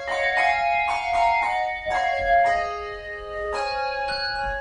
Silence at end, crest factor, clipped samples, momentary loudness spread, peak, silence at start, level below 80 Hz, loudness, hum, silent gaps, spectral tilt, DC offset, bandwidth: 0 s; 16 dB; under 0.1%; 11 LU; -8 dBFS; 0 s; -44 dBFS; -23 LUFS; none; none; -2.5 dB/octave; under 0.1%; 10 kHz